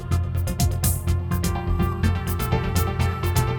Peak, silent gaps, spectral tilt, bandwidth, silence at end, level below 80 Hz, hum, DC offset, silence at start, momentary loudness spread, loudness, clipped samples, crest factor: -8 dBFS; none; -5.5 dB/octave; over 20 kHz; 0 s; -30 dBFS; none; under 0.1%; 0 s; 3 LU; -24 LUFS; under 0.1%; 16 dB